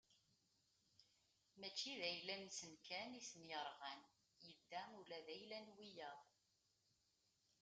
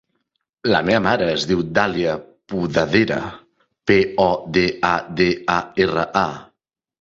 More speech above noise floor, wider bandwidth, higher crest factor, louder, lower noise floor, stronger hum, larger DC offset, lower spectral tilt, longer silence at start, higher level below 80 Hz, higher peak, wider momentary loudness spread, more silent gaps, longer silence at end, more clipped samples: second, 31 dB vs 54 dB; first, 9 kHz vs 7.8 kHz; about the same, 24 dB vs 20 dB; second, -52 LUFS vs -19 LUFS; first, -85 dBFS vs -73 dBFS; neither; neither; second, -1.5 dB/octave vs -5.5 dB/octave; second, 0.1 s vs 0.65 s; second, under -90 dBFS vs -48 dBFS; second, -32 dBFS vs 0 dBFS; first, 14 LU vs 9 LU; neither; first, 1.4 s vs 0.55 s; neither